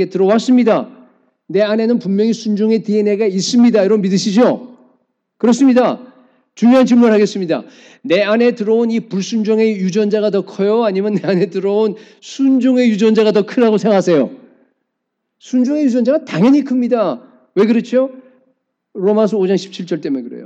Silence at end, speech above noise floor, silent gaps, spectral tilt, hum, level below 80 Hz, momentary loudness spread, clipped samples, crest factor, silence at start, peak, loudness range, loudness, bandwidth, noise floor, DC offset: 0 s; 60 dB; none; -6 dB/octave; none; -70 dBFS; 9 LU; under 0.1%; 14 dB; 0 s; 0 dBFS; 2 LU; -14 LUFS; 8.2 kHz; -74 dBFS; under 0.1%